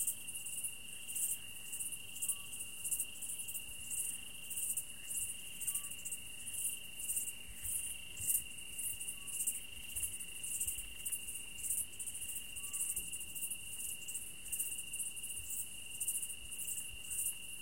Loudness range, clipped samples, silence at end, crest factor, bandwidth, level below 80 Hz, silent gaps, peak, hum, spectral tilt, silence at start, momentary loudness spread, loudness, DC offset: 1 LU; under 0.1%; 0 s; 24 dB; 17 kHz; -64 dBFS; none; -18 dBFS; none; 1 dB/octave; 0 s; 5 LU; -40 LUFS; 0.3%